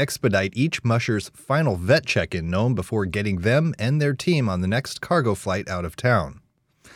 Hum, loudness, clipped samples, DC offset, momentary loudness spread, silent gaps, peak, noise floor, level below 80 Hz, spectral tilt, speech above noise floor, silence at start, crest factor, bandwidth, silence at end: none; -23 LUFS; under 0.1%; under 0.1%; 6 LU; none; -6 dBFS; -56 dBFS; -52 dBFS; -6 dB/octave; 34 dB; 0 s; 16 dB; 15.5 kHz; 0.55 s